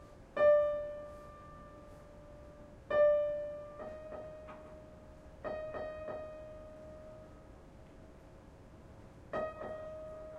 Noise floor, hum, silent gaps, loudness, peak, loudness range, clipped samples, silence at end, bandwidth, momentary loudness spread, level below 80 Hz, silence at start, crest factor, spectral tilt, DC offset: -55 dBFS; none; none; -35 LUFS; -18 dBFS; 14 LU; under 0.1%; 0 s; 6.6 kHz; 27 LU; -60 dBFS; 0 s; 20 dB; -6.5 dB/octave; under 0.1%